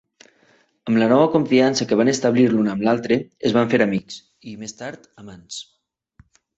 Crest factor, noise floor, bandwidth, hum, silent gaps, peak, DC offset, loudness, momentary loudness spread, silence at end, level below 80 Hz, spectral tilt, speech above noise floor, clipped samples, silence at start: 18 dB; -59 dBFS; 8.2 kHz; none; none; -4 dBFS; under 0.1%; -18 LUFS; 18 LU; 0.95 s; -58 dBFS; -5.5 dB/octave; 40 dB; under 0.1%; 0.85 s